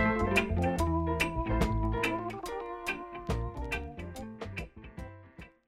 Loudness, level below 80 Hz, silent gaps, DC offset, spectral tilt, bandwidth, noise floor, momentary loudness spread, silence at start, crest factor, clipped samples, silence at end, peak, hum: -33 LUFS; -40 dBFS; none; under 0.1%; -6 dB/octave; 16 kHz; -52 dBFS; 18 LU; 0 s; 18 dB; under 0.1%; 0.2 s; -14 dBFS; none